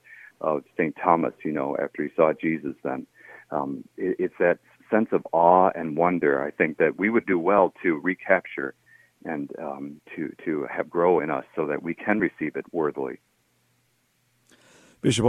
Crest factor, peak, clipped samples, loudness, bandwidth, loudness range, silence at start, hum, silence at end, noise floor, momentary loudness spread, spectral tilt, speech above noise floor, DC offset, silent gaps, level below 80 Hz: 22 dB; -4 dBFS; under 0.1%; -25 LUFS; 11.5 kHz; 7 LU; 0.1 s; none; 0 s; -68 dBFS; 13 LU; -6 dB/octave; 44 dB; under 0.1%; none; -66 dBFS